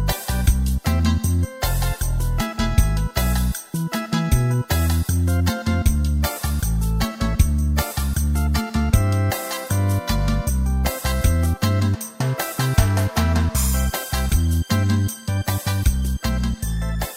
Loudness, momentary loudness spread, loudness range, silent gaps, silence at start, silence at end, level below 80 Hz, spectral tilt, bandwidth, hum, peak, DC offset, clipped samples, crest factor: -21 LUFS; 4 LU; 1 LU; none; 0 s; 0 s; -24 dBFS; -5 dB/octave; 16.5 kHz; none; -2 dBFS; under 0.1%; under 0.1%; 18 dB